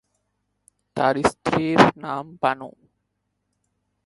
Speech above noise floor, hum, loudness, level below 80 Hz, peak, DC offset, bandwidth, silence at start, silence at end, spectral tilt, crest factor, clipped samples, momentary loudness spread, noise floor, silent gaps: 55 dB; 50 Hz at -50 dBFS; -21 LUFS; -54 dBFS; 0 dBFS; under 0.1%; 11.5 kHz; 0.95 s; 1.35 s; -5.5 dB/octave; 24 dB; under 0.1%; 16 LU; -75 dBFS; none